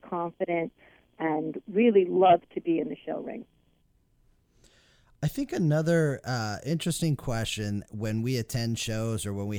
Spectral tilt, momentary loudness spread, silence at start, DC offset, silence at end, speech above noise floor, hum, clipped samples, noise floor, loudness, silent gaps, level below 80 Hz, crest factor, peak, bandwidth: -6 dB/octave; 12 LU; 0.05 s; under 0.1%; 0 s; 40 dB; none; under 0.1%; -67 dBFS; -28 LUFS; none; -54 dBFS; 18 dB; -10 dBFS; 19.5 kHz